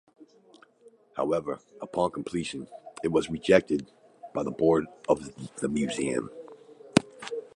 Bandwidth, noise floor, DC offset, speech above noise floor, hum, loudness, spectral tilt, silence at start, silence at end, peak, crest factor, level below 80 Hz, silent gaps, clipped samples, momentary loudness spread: 11 kHz; -58 dBFS; under 0.1%; 31 dB; none; -29 LUFS; -5.5 dB/octave; 0.2 s; 0.1 s; -4 dBFS; 26 dB; -60 dBFS; none; under 0.1%; 18 LU